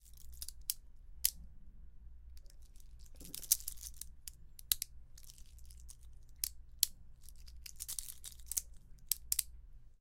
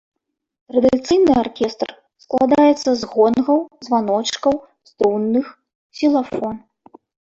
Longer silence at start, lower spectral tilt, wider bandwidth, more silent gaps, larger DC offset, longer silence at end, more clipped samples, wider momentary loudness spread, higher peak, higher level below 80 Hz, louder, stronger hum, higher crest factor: second, 0 s vs 0.75 s; second, 1 dB/octave vs -5 dB/octave; first, 17 kHz vs 7.8 kHz; second, none vs 5.75-5.90 s; neither; second, 0 s vs 0.8 s; neither; first, 25 LU vs 11 LU; second, -6 dBFS vs -2 dBFS; about the same, -54 dBFS vs -52 dBFS; second, -39 LUFS vs -18 LUFS; neither; first, 38 dB vs 16 dB